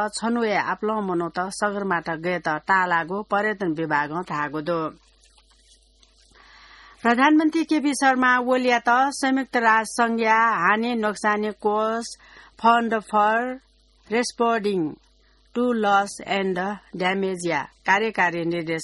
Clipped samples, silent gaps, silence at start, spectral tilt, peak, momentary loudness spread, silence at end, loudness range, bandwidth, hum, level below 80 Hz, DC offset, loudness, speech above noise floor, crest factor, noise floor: under 0.1%; none; 0 s; -4.5 dB/octave; -6 dBFS; 8 LU; 0 s; 6 LU; 11.5 kHz; none; -62 dBFS; under 0.1%; -22 LUFS; 36 dB; 18 dB; -58 dBFS